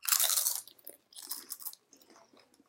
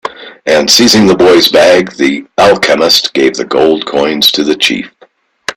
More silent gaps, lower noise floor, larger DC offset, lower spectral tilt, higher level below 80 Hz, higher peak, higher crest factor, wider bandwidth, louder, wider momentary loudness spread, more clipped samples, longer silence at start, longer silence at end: neither; first, -63 dBFS vs -45 dBFS; neither; second, 4 dB/octave vs -3 dB/octave; second, under -90 dBFS vs -46 dBFS; second, -10 dBFS vs 0 dBFS; first, 26 dB vs 8 dB; second, 17 kHz vs over 20 kHz; second, -31 LUFS vs -7 LUFS; first, 24 LU vs 9 LU; second, under 0.1% vs 0.4%; about the same, 0.05 s vs 0.05 s; first, 0.95 s vs 0.05 s